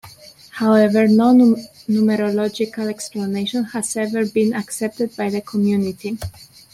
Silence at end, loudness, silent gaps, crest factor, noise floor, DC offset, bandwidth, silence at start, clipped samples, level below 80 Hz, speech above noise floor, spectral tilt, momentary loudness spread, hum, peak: 0.3 s; -18 LUFS; none; 14 dB; -43 dBFS; under 0.1%; 14 kHz; 0.05 s; under 0.1%; -56 dBFS; 25 dB; -5.5 dB/octave; 12 LU; none; -4 dBFS